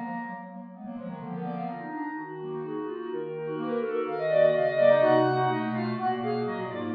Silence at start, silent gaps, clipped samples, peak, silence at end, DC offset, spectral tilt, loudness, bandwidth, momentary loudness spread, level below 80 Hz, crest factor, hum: 0 s; none; under 0.1%; -10 dBFS; 0 s; under 0.1%; -9.5 dB/octave; -28 LUFS; 5.2 kHz; 16 LU; -78 dBFS; 18 dB; none